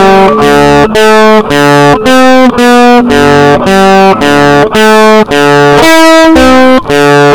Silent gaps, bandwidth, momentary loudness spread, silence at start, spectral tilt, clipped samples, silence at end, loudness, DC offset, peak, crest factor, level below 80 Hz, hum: none; 19.5 kHz; 3 LU; 0 s; -5 dB/octave; 20%; 0 s; -3 LUFS; 7%; 0 dBFS; 4 dB; -28 dBFS; none